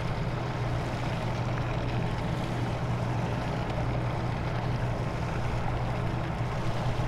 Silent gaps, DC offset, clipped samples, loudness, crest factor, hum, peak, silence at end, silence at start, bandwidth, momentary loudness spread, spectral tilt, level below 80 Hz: none; under 0.1%; under 0.1%; -31 LUFS; 12 dB; none; -18 dBFS; 0 s; 0 s; 11.5 kHz; 1 LU; -7 dB/octave; -38 dBFS